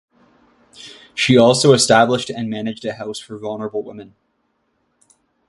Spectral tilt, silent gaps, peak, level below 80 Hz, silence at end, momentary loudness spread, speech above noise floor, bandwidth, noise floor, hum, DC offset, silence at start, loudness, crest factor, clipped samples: -4 dB/octave; none; 0 dBFS; -56 dBFS; 1.45 s; 18 LU; 51 dB; 11.5 kHz; -67 dBFS; none; under 0.1%; 0.8 s; -16 LUFS; 20 dB; under 0.1%